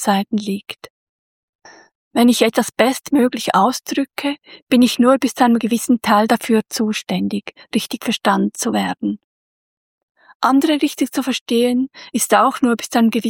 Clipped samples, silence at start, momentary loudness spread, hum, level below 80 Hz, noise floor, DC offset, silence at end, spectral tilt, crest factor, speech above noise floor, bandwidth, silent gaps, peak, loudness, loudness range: under 0.1%; 0 s; 10 LU; none; -62 dBFS; under -90 dBFS; under 0.1%; 0 s; -4 dB/octave; 16 dB; over 73 dB; 17.5 kHz; 0.90-1.59 s, 1.95-2.11 s, 4.62-4.67 s, 9.24-10.15 s, 10.35-10.40 s, 11.41-11.46 s; 0 dBFS; -17 LUFS; 4 LU